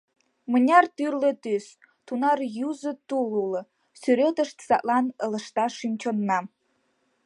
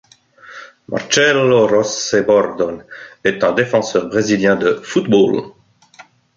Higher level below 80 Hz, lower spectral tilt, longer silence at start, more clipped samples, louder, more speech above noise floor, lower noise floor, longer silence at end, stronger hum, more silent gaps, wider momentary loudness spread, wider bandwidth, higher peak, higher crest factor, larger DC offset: second, -78 dBFS vs -56 dBFS; first, -5.5 dB/octave vs -4 dB/octave; about the same, 0.5 s vs 0.45 s; neither; second, -25 LUFS vs -15 LUFS; first, 46 dB vs 30 dB; first, -71 dBFS vs -45 dBFS; first, 0.8 s vs 0.35 s; neither; neither; about the same, 11 LU vs 13 LU; first, 11 kHz vs 7.6 kHz; second, -6 dBFS vs 0 dBFS; about the same, 20 dB vs 16 dB; neither